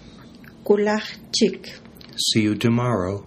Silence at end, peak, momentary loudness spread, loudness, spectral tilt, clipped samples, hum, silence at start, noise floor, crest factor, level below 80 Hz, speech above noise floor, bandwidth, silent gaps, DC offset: 0.05 s; -4 dBFS; 16 LU; -21 LUFS; -4.5 dB/octave; under 0.1%; none; 0.05 s; -44 dBFS; 20 dB; -56 dBFS; 23 dB; 15 kHz; none; under 0.1%